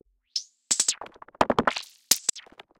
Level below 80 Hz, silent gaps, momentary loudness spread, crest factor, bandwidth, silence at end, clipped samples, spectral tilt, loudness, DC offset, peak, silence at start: -58 dBFS; none; 13 LU; 26 dB; 17 kHz; 0.4 s; under 0.1%; -1 dB/octave; -26 LUFS; under 0.1%; -2 dBFS; 0.35 s